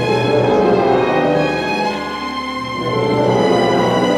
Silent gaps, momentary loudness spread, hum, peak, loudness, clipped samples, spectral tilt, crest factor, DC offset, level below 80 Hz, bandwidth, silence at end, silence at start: none; 8 LU; none; -2 dBFS; -16 LUFS; under 0.1%; -6 dB/octave; 12 dB; under 0.1%; -44 dBFS; 13.5 kHz; 0 s; 0 s